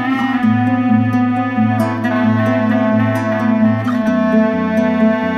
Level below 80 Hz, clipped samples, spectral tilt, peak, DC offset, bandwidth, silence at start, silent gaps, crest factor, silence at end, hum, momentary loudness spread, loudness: -54 dBFS; under 0.1%; -8 dB/octave; -2 dBFS; under 0.1%; 13.5 kHz; 0 s; none; 12 dB; 0 s; none; 2 LU; -15 LUFS